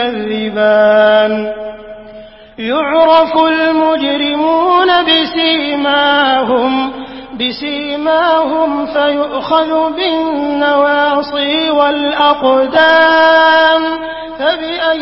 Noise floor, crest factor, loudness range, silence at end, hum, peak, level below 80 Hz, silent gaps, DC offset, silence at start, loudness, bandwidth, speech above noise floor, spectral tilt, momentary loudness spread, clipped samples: -34 dBFS; 12 dB; 4 LU; 0 s; none; 0 dBFS; -48 dBFS; none; under 0.1%; 0 s; -11 LUFS; 5.8 kHz; 23 dB; -6.5 dB/octave; 10 LU; under 0.1%